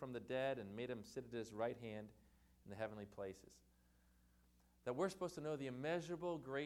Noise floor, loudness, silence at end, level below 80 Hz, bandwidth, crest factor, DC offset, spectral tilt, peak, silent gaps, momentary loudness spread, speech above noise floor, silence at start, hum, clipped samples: -74 dBFS; -47 LUFS; 0 s; -74 dBFS; 17.5 kHz; 20 dB; under 0.1%; -6 dB/octave; -28 dBFS; none; 10 LU; 27 dB; 0 s; none; under 0.1%